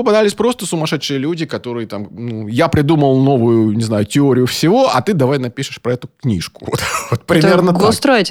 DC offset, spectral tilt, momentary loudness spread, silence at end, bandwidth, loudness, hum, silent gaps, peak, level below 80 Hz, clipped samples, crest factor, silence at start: under 0.1%; -5.5 dB/octave; 11 LU; 0 s; 18 kHz; -15 LUFS; none; none; -2 dBFS; -46 dBFS; under 0.1%; 14 dB; 0 s